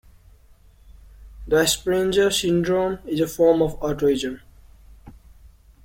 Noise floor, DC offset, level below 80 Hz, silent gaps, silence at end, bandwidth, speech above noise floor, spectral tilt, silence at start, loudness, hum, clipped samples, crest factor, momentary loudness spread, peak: -52 dBFS; under 0.1%; -44 dBFS; none; 0.75 s; 16.5 kHz; 31 dB; -4 dB/octave; 0.9 s; -21 LUFS; none; under 0.1%; 18 dB; 7 LU; -6 dBFS